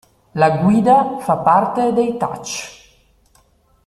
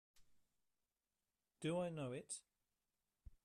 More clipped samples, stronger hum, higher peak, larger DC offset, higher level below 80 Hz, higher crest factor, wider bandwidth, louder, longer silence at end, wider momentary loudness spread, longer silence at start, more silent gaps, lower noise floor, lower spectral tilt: neither; neither; first, -2 dBFS vs -32 dBFS; neither; first, -54 dBFS vs -74 dBFS; about the same, 16 dB vs 18 dB; about the same, 14 kHz vs 13 kHz; first, -16 LUFS vs -47 LUFS; first, 1.15 s vs 0.1 s; first, 14 LU vs 9 LU; first, 0.35 s vs 0.2 s; neither; second, -56 dBFS vs under -90 dBFS; about the same, -6 dB/octave vs -5 dB/octave